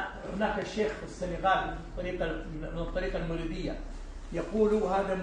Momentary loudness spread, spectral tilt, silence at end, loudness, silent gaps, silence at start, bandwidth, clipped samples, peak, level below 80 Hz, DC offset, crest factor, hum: 11 LU; -6 dB/octave; 0 s; -32 LUFS; none; 0 s; 10 kHz; under 0.1%; -14 dBFS; -42 dBFS; under 0.1%; 18 dB; none